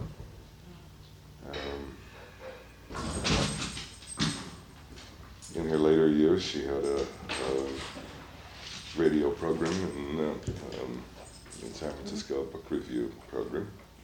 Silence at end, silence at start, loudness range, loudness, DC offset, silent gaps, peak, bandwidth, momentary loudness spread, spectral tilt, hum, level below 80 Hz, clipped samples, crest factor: 0 s; 0 s; 8 LU; -31 LUFS; under 0.1%; none; -12 dBFS; 18.5 kHz; 22 LU; -5 dB/octave; none; -50 dBFS; under 0.1%; 20 dB